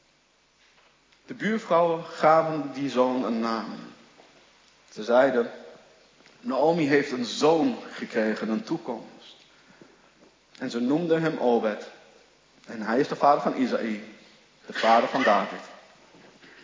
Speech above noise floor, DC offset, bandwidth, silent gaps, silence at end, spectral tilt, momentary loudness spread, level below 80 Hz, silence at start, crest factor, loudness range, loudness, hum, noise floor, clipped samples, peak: 39 dB; under 0.1%; 7.6 kHz; none; 0.9 s; -5.5 dB/octave; 17 LU; -78 dBFS; 1.3 s; 20 dB; 4 LU; -25 LUFS; none; -64 dBFS; under 0.1%; -6 dBFS